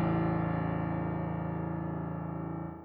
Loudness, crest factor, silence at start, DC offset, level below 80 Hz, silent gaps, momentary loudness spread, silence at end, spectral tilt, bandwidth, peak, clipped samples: -34 LUFS; 14 dB; 0 s; under 0.1%; -50 dBFS; none; 7 LU; 0 s; -12 dB/octave; 4.3 kHz; -18 dBFS; under 0.1%